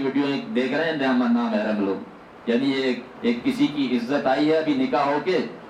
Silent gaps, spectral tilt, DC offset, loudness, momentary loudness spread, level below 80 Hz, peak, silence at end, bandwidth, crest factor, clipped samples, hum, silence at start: none; -6 dB/octave; under 0.1%; -23 LUFS; 6 LU; -64 dBFS; -8 dBFS; 0 s; 10.5 kHz; 14 dB; under 0.1%; none; 0 s